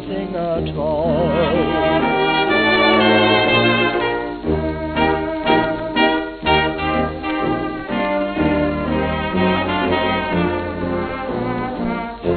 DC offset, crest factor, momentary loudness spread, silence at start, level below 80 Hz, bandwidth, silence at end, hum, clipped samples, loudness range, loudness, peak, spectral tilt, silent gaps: under 0.1%; 16 dB; 9 LU; 0 s; -36 dBFS; 4.6 kHz; 0 s; none; under 0.1%; 4 LU; -18 LUFS; -2 dBFS; -9.5 dB/octave; none